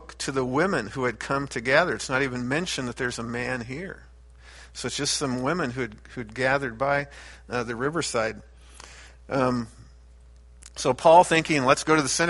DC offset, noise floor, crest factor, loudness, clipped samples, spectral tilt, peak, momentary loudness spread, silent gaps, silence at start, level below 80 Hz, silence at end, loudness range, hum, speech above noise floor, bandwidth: under 0.1%; -50 dBFS; 22 dB; -25 LUFS; under 0.1%; -4 dB/octave; -4 dBFS; 18 LU; none; 0 s; -50 dBFS; 0 s; 7 LU; none; 25 dB; 11.5 kHz